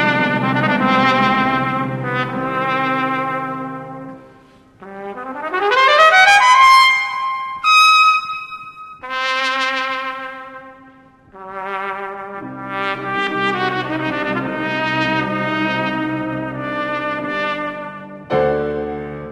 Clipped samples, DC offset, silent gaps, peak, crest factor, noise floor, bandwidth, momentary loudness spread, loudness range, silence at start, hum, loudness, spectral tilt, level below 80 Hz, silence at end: under 0.1%; under 0.1%; none; 0 dBFS; 18 dB; -47 dBFS; 13 kHz; 20 LU; 12 LU; 0 s; none; -16 LUFS; -4 dB/octave; -52 dBFS; 0 s